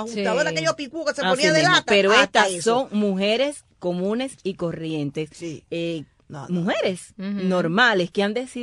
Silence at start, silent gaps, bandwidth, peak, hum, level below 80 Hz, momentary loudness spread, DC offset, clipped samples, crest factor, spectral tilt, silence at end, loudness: 0 s; none; 12.5 kHz; -4 dBFS; none; -60 dBFS; 15 LU; under 0.1%; under 0.1%; 18 dB; -4 dB/octave; 0 s; -21 LUFS